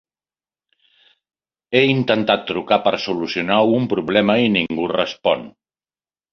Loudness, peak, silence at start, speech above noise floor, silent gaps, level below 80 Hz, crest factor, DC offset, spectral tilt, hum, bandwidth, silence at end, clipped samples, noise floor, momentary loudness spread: -18 LUFS; -2 dBFS; 1.7 s; over 72 dB; none; -58 dBFS; 18 dB; under 0.1%; -6.5 dB/octave; none; 6.8 kHz; 0.85 s; under 0.1%; under -90 dBFS; 5 LU